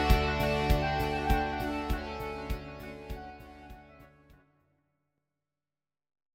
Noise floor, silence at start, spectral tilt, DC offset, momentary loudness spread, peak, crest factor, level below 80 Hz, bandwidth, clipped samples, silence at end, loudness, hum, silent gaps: under -90 dBFS; 0 s; -6 dB/octave; under 0.1%; 22 LU; -10 dBFS; 22 dB; -38 dBFS; 16.5 kHz; under 0.1%; 2.3 s; -31 LUFS; none; none